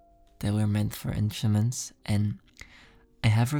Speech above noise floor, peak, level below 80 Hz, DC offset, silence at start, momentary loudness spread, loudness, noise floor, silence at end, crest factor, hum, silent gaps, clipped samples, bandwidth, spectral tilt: 30 dB; -12 dBFS; -50 dBFS; under 0.1%; 0.4 s; 11 LU; -28 LUFS; -56 dBFS; 0 s; 16 dB; none; none; under 0.1%; 17.5 kHz; -6 dB/octave